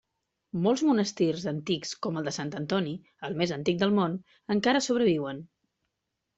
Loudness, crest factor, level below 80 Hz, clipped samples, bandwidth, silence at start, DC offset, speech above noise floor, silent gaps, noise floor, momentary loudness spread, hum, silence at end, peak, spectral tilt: -28 LUFS; 16 dB; -66 dBFS; under 0.1%; 8.2 kHz; 0.55 s; under 0.1%; 55 dB; none; -83 dBFS; 12 LU; none; 0.9 s; -12 dBFS; -5 dB/octave